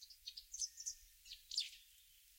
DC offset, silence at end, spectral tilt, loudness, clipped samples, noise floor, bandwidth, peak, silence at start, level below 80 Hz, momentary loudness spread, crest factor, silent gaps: under 0.1%; 0 s; 5.5 dB/octave; -46 LUFS; under 0.1%; -67 dBFS; 16.5 kHz; -26 dBFS; 0 s; -76 dBFS; 18 LU; 26 dB; none